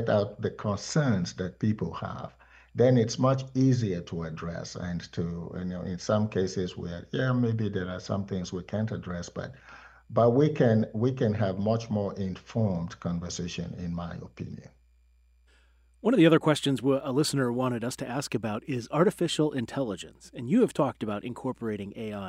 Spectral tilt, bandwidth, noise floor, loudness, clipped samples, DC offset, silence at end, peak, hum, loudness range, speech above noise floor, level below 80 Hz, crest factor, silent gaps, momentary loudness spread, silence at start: -6.5 dB/octave; 15.5 kHz; -62 dBFS; -28 LUFS; under 0.1%; under 0.1%; 0 s; -8 dBFS; none; 6 LU; 34 dB; -58 dBFS; 20 dB; none; 13 LU; 0 s